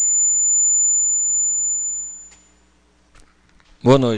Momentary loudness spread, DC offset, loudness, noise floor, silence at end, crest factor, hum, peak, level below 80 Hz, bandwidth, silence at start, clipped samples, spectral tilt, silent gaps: 12 LU; under 0.1%; -15 LUFS; -57 dBFS; 0 s; 18 dB; none; 0 dBFS; -52 dBFS; 9.8 kHz; 0 s; under 0.1%; -3.5 dB/octave; none